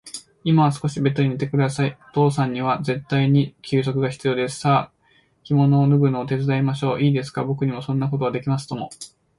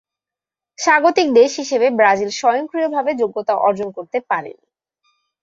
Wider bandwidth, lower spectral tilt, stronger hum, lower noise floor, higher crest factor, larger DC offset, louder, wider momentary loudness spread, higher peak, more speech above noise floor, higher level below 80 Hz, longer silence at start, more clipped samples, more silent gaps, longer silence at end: first, 11.5 kHz vs 7.8 kHz; first, -7 dB/octave vs -3 dB/octave; neither; second, -60 dBFS vs -88 dBFS; about the same, 16 dB vs 16 dB; neither; second, -21 LUFS vs -17 LUFS; about the same, 8 LU vs 10 LU; about the same, -4 dBFS vs -2 dBFS; second, 40 dB vs 72 dB; first, -58 dBFS vs -66 dBFS; second, 0.05 s vs 0.8 s; neither; neither; second, 0.3 s vs 0.9 s